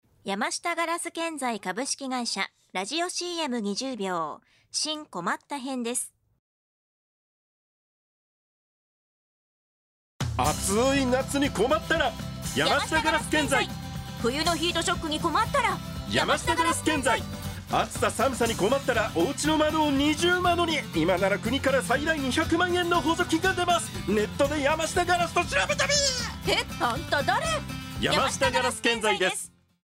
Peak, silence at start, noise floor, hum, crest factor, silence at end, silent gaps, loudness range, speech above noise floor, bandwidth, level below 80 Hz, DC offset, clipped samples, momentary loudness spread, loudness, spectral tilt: -8 dBFS; 0.25 s; under -90 dBFS; none; 18 dB; 0.45 s; 6.39-10.19 s; 8 LU; over 64 dB; 16 kHz; -46 dBFS; under 0.1%; under 0.1%; 8 LU; -26 LUFS; -3.5 dB/octave